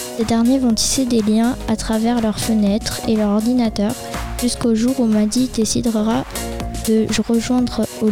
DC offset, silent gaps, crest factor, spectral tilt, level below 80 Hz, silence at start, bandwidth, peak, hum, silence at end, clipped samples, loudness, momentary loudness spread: 0.5%; none; 12 dB; -4.5 dB/octave; -34 dBFS; 0 s; 16.5 kHz; -4 dBFS; none; 0 s; under 0.1%; -18 LUFS; 6 LU